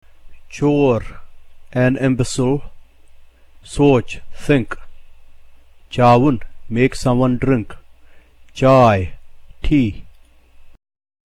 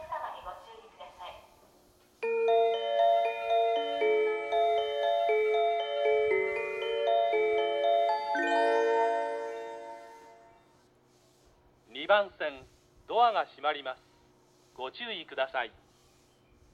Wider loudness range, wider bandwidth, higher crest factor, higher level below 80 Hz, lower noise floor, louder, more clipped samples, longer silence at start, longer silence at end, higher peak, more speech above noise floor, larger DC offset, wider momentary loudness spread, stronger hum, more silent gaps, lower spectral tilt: second, 3 LU vs 7 LU; first, 12 kHz vs 9.6 kHz; about the same, 16 dB vs 18 dB; first, -34 dBFS vs -70 dBFS; second, -45 dBFS vs -64 dBFS; first, -16 LUFS vs -29 LUFS; neither; first, 0.25 s vs 0 s; second, 0.6 s vs 1.05 s; first, -2 dBFS vs -12 dBFS; about the same, 30 dB vs 32 dB; neither; about the same, 18 LU vs 18 LU; neither; neither; first, -7 dB/octave vs -3 dB/octave